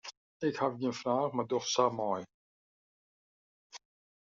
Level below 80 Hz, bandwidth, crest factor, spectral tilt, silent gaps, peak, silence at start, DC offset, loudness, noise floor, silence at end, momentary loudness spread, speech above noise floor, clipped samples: -80 dBFS; 7.4 kHz; 22 dB; -4 dB/octave; 0.17-0.40 s, 2.34-3.70 s; -12 dBFS; 0.05 s; under 0.1%; -33 LUFS; under -90 dBFS; 0.45 s; 23 LU; over 58 dB; under 0.1%